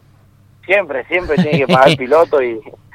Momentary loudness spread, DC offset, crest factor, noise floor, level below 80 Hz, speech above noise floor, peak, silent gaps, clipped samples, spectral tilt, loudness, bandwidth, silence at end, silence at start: 8 LU; under 0.1%; 14 dB; -48 dBFS; -44 dBFS; 34 dB; 0 dBFS; none; 0.2%; -6 dB/octave; -13 LUFS; 15.5 kHz; 0.25 s; 0.7 s